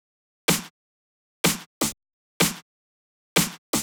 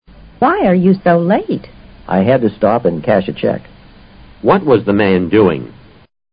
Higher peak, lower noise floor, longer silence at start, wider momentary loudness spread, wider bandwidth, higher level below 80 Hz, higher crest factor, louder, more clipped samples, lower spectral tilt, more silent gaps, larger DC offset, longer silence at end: second, -4 dBFS vs 0 dBFS; first, under -90 dBFS vs -40 dBFS; about the same, 0.5 s vs 0.4 s; first, 12 LU vs 8 LU; first, over 20 kHz vs 5.2 kHz; second, -56 dBFS vs -42 dBFS; first, 24 dB vs 14 dB; second, -25 LUFS vs -13 LUFS; neither; second, -2.5 dB/octave vs -12.5 dB/octave; first, 0.70-1.44 s, 1.66-1.81 s, 2.13-2.40 s, 2.62-3.36 s, 3.58-3.73 s vs none; neither; second, 0 s vs 0.65 s